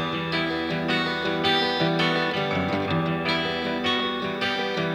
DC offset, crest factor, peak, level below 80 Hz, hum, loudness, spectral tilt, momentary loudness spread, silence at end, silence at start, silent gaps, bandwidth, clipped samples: under 0.1%; 14 dB; -10 dBFS; -56 dBFS; none; -24 LUFS; -5.5 dB/octave; 4 LU; 0 s; 0 s; none; 15.5 kHz; under 0.1%